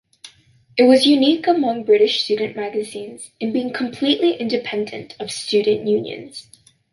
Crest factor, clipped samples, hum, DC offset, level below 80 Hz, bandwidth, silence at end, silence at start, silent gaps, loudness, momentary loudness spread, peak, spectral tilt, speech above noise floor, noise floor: 16 dB; under 0.1%; none; under 0.1%; -66 dBFS; 11.5 kHz; 0.5 s; 0.25 s; none; -18 LUFS; 17 LU; -2 dBFS; -4 dB/octave; 33 dB; -51 dBFS